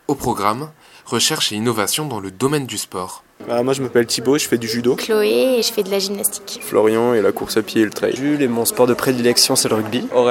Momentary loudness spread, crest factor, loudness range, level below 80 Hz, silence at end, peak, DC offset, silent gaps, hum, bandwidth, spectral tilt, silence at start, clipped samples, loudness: 9 LU; 18 dB; 3 LU; -54 dBFS; 0 s; 0 dBFS; under 0.1%; none; none; 17 kHz; -3.5 dB/octave; 0.1 s; under 0.1%; -18 LUFS